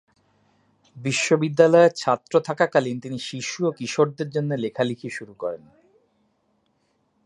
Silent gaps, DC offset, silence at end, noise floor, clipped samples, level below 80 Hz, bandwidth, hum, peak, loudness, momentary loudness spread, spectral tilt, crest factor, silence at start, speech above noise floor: none; under 0.1%; 1.7 s; -68 dBFS; under 0.1%; -70 dBFS; 11 kHz; none; -2 dBFS; -22 LUFS; 15 LU; -5 dB/octave; 22 dB; 0.95 s; 47 dB